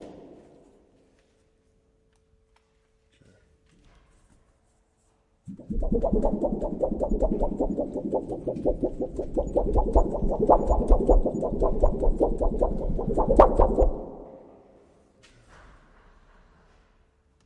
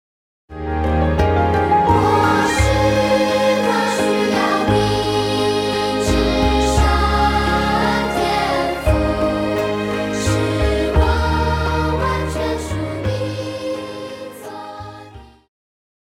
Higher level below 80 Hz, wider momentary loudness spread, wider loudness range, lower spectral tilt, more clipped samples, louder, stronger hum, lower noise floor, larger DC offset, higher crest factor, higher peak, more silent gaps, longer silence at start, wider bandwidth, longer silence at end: about the same, -30 dBFS vs -26 dBFS; about the same, 12 LU vs 11 LU; about the same, 8 LU vs 7 LU; first, -9.5 dB/octave vs -5.5 dB/octave; neither; second, -26 LUFS vs -17 LUFS; neither; first, -67 dBFS vs -40 dBFS; neither; first, 24 dB vs 14 dB; about the same, -2 dBFS vs -2 dBFS; neither; second, 0 s vs 0.5 s; second, 8.4 kHz vs 16 kHz; first, 3.05 s vs 0.8 s